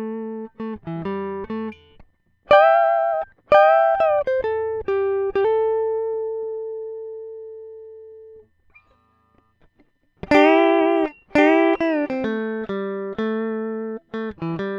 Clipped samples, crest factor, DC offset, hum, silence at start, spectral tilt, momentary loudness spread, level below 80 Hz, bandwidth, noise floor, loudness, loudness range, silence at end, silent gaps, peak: under 0.1%; 20 dB; under 0.1%; none; 0 s; -7 dB/octave; 18 LU; -54 dBFS; 7.4 kHz; -61 dBFS; -20 LUFS; 12 LU; 0 s; none; 0 dBFS